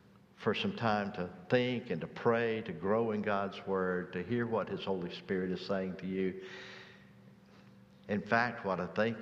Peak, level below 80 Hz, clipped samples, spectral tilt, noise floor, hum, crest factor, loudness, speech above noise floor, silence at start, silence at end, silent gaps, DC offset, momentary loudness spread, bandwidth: -12 dBFS; -70 dBFS; under 0.1%; -7 dB/octave; -58 dBFS; none; 22 dB; -35 LUFS; 24 dB; 0.4 s; 0 s; none; under 0.1%; 8 LU; 7.4 kHz